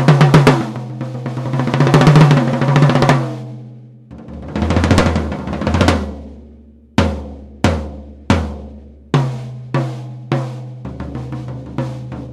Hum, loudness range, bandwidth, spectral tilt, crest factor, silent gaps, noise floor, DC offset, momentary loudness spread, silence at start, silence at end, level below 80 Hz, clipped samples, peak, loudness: none; 9 LU; 12 kHz; -7 dB/octave; 16 dB; none; -42 dBFS; under 0.1%; 21 LU; 0 s; 0 s; -34 dBFS; under 0.1%; 0 dBFS; -15 LUFS